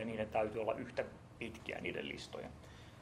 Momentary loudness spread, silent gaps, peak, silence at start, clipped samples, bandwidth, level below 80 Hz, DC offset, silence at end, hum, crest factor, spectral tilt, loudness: 13 LU; none; -22 dBFS; 0 s; under 0.1%; 14 kHz; -64 dBFS; under 0.1%; 0 s; none; 20 dB; -5.5 dB/octave; -42 LUFS